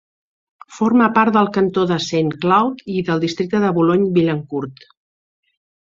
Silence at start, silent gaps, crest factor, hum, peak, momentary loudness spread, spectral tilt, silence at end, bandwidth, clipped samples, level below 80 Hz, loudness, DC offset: 0.7 s; none; 16 dB; none; -2 dBFS; 9 LU; -6.5 dB/octave; 1.15 s; 7.6 kHz; under 0.1%; -58 dBFS; -17 LUFS; under 0.1%